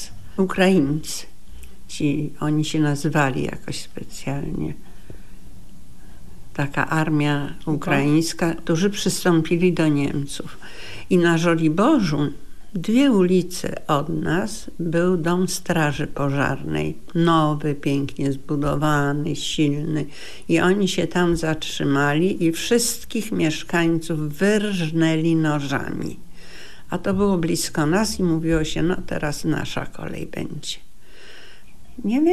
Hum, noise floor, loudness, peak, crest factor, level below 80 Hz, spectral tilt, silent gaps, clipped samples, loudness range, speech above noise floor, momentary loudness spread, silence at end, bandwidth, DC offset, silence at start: none; -46 dBFS; -22 LUFS; -4 dBFS; 18 dB; -42 dBFS; -5.5 dB/octave; none; under 0.1%; 6 LU; 25 dB; 13 LU; 0 s; 13.5 kHz; 3%; 0 s